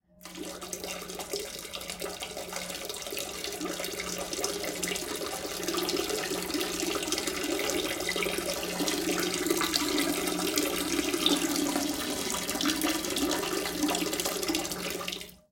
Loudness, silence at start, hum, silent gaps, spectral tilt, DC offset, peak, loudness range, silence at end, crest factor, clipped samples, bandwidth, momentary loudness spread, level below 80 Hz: -30 LUFS; 0.2 s; none; none; -2 dB/octave; under 0.1%; -6 dBFS; 7 LU; 0.15 s; 26 dB; under 0.1%; 17 kHz; 9 LU; -56 dBFS